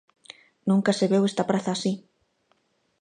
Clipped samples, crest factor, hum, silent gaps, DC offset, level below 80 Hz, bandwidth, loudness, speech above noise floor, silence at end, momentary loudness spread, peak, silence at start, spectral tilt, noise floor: under 0.1%; 18 dB; none; none; under 0.1%; -72 dBFS; 10 kHz; -25 LUFS; 46 dB; 1 s; 9 LU; -8 dBFS; 0.65 s; -6 dB/octave; -69 dBFS